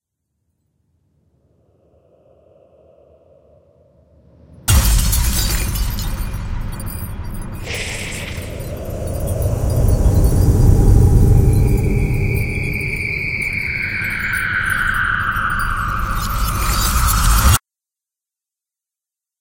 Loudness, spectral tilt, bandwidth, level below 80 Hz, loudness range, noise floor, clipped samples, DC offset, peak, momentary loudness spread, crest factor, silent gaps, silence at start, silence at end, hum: -18 LUFS; -4.5 dB/octave; 17 kHz; -22 dBFS; 9 LU; -87 dBFS; under 0.1%; under 0.1%; 0 dBFS; 14 LU; 18 dB; none; 4.65 s; 1.8 s; none